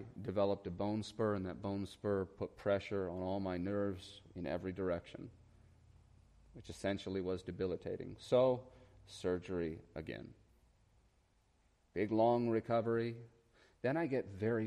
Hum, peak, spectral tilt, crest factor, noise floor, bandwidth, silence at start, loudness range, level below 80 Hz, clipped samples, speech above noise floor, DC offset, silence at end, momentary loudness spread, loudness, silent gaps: none; -20 dBFS; -7 dB/octave; 18 dB; -74 dBFS; 12 kHz; 0 s; 6 LU; -66 dBFS; under 0.1%; 36 dB; under 0.1%; 0 s; 15 LU; -39 LUFS; none